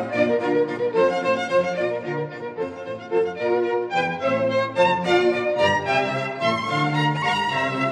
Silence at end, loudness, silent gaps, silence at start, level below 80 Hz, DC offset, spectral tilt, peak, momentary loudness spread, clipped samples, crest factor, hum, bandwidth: 0 s; -22 LUFS; none; 0 s; -66 dBFS; under 0.1%; -5.5 dB/octave; -6 dBFS; 8 LU; under 0.1%; 16 dB; none; 10.5 kHz